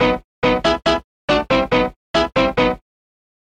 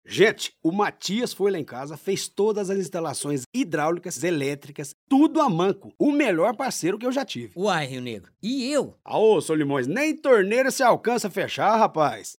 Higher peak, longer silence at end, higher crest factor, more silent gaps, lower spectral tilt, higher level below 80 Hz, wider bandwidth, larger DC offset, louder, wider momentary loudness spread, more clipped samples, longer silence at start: about the same, -4 dBFS vs -6 dBFS; first, 0.65 s vs 0.05 s; about the same, 16 dB vs 18 dB; first, 0.24-0.42 s, 1.04-1.28 s, 1.96-2.14 s vs 3.46-3.52 s, 4.94-5.07 s; about the same, -5 dB/octave vs -4.5 dB/octave; first, -36 dBFS vs -74 dBFS; second, 9.8 kHz vs 17 kHz; neither; first, -18 LUFS vs -23 LUFS; second, 4 LU vs 10 LU; neither; about the same, 0 s vs 0.1 s